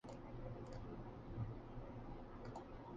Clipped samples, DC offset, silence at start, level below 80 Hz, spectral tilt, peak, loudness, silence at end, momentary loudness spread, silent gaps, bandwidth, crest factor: under 0.1%; under 0.1%; 0.05 s; -58 dBFS; -8 dB/octave; -34 dBFS; -53 LUFS; 0 s; 5 LU; none; 8.6 kHz; 16 dB